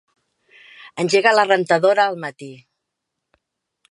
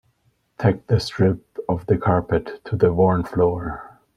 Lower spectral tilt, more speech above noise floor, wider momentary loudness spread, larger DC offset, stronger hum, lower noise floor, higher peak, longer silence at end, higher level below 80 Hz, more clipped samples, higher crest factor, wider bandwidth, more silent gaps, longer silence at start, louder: second, -4 dB/octave vs -8 dB/octave; first, 62 dB vs 46 dB; first, 22 LU vs 10 LU; neither; neither; first, -79 dBFS vs -65 dBFS; about the same, 0 dBFS vs -2 dBFS; first, 1.35 s vs 0.3 s; second, -76 dBFS vs -44 dBFS; neither; about the same, 20 dB vs 18 dB; about the same, 11.5 kHz vs 11.5 kHz; neither; first, 0.8 s vs 0.6 s; first, -17 LUFS vs -21 LUFS